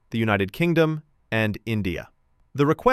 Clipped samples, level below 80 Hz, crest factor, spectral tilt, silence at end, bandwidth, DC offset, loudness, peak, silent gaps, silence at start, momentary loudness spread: under 0.1%; -48 dBFS; 18 dB; -7 dB/octave; 0 s; 15 kHz; under 0.1%; -24 LUFS; -4 dBFS; none; 0.1 s; 12 LU